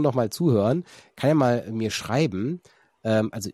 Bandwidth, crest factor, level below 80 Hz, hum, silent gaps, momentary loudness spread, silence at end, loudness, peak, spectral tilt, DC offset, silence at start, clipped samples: 14.5 kHz; 16 dB; -62 dBFS; none; none; 10 LU; 0 s; -24 LUFS; -8 dBFS; -6.5 dB/octave; under 0.1%; 0 s; under 0.1%